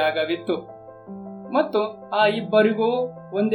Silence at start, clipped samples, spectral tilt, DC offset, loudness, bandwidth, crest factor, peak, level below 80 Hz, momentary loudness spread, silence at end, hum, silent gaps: 0 s; under 0.1%; -7 dB/octave; under 0.1%; -22 LUFS; 17 kHz; 16 dB; -6 dBFS; -68 dBFS; 19 LU; 0 s; none; none